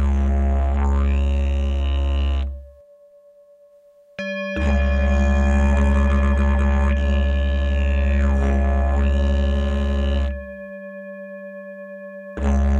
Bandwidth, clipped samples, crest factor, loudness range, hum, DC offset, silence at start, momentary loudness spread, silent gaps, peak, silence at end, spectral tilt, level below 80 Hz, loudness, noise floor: 7.4 kHz; under 0.1%; 12 dB; 7 LU; none; under 0.1%; 0 s; 16 LU; none; -8 dBFS; 0 s; -7.5 dB/octave; -20 dBFS; -21 LUFS; -51 dBFS